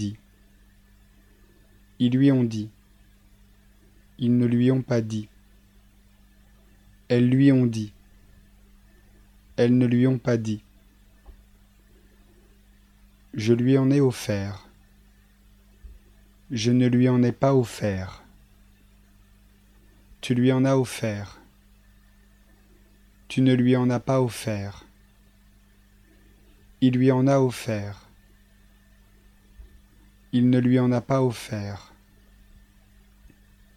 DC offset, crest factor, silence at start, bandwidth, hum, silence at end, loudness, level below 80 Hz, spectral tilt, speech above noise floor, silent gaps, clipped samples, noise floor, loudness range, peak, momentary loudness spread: under 0.1%; 20 dB; 0 s; 14 kHz; 50 Hz at -55 dBFS; 2 s; -23 LUFS; -56 dBFS; -7.5 dB/octave; 35 dB; none; under 0.1%; -56 dBFS; 3 LU; -6 dBFS; 16 LU